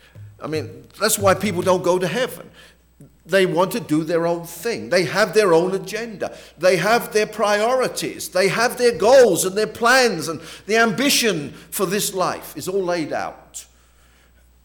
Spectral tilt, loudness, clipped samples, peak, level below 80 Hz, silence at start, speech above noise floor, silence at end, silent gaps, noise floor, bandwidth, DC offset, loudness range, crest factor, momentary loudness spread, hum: -3.5 dB/octave; -19 LUFS; under 0.1%; -6 dBFS; -56 dBFS; 0.15 s; 34 dB; 1 s; none; -53 dBFS; over 20 kHz; under 0.1%; 5 LU; 14 dB; 13 LU; none